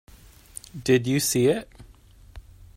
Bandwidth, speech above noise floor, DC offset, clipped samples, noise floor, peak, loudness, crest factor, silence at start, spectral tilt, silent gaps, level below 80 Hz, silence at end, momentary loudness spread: 16 kHz; 28 dB; under 0.1%; under 0.1%; -51 dBFS; -8 dBFS; -23 LUFS; 20 dB; 0.75 s; -4.5 dB/octave; none; -50 dBFS; 0.35 s; 21 LU